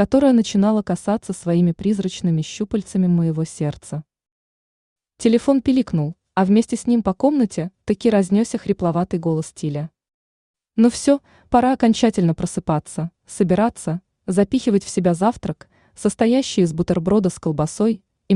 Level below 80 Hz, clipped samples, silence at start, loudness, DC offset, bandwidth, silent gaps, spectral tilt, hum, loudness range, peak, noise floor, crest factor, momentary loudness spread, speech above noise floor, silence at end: -50 dBFS; under 0.1%; 0 s; -20 LUFS; under 0.1%; 11 kHz; 4.31-4.96 s, 10.14-10.54 s; -6.5 dB/octave; none; 3 LU; -4 dBFS; under -90 dBFS; 16 dB; 10 LU; over 72 dB; 0 s